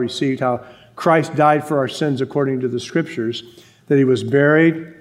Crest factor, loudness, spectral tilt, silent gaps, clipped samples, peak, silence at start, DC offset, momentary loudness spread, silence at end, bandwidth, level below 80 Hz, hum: 18 dB; -18 LUFS; -6.5 dB/octave; none; under 0.1%; 0 dBFS; 0 s; under 0.1%; 9 LU; 0.1 s; 15 kHz; -66 dBFS; none